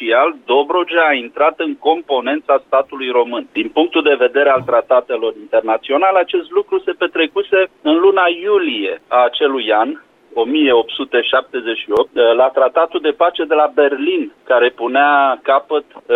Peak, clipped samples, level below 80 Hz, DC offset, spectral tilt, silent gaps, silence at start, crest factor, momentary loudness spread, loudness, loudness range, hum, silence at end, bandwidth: -2 dBFS; under 0.1%; -60 dBFS; under 0.1%; -6 dB/octave; none; 0 s; 12 dB; 6 LU; -15 LUFS; 1 LU; none; 0 s; 4.2 kHz